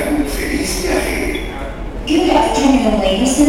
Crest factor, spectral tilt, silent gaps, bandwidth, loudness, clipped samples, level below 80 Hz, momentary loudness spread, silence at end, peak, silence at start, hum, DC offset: 14 dB; -4 dB/octave; none; 16.5 kHz; -16 LUFS; under 0.1%; -26 dBFS; 13 LU; 0 s; 0 dBFS; 0 s; none; 0.5%